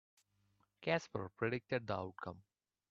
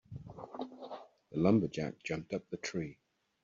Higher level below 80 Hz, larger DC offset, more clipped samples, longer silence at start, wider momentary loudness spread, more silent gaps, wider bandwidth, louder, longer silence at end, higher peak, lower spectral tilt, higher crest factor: second, -76 dBFS vs -68 dBFS; neither; neither; first, 0.8 s vs 0.1 s; second, 12 LU vs 19 LU; neither; about the same, 8 kHz vs 7.6 kHz; second, -41 LUFS vs -36 LUFS; about the same, 0.5 s vs 0.5 s; second, -20 dBFS vs -16 dBFS; second, -4.5 dB/octave vs -6.5 dB/octave; about the same, 22 dB vs 22 dB